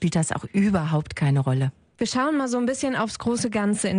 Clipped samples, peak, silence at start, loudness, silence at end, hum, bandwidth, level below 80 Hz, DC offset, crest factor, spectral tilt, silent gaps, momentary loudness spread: under 0.1%; -10 dBFS; 0 s; -24 LUFS; 0 s; none; 10.5 kHz; -52 dBFS; under 0.1%; 14 dB; -5.5 dB/octave; none; 4 LU